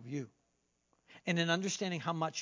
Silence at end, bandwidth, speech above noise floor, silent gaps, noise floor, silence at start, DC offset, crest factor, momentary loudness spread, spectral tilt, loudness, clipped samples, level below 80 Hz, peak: 0 s; 7.6 kHz; 44 dB; none; -79 dBFS; 0 s; under 0.1%; 22 dB; 11 LU; -4 dB/octave; -35 LUFS; under 0.1%; -84 dBFS; -16 dBFS